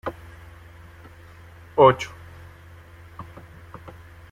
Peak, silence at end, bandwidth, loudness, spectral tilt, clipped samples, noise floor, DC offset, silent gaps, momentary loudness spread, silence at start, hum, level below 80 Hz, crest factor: -2 dBFS; 1.1 s; 15 kHz; -20 LUFS; -6 dB/octave; under 0.1%; -46 dBFS; under 0.1%; none; 30 LU; 0.05 s; none; -52 dBFS; 24 dB